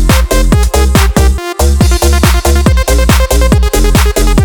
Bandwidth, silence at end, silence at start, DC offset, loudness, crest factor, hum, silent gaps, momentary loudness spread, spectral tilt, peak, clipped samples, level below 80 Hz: 20 kHz; 0 s; 0 s; under 0.1%; -9 LUFS; 8 dB; none; none; 1 LU; -5 dB/octave; 0 dBFS; 0.5%; -8 dBFS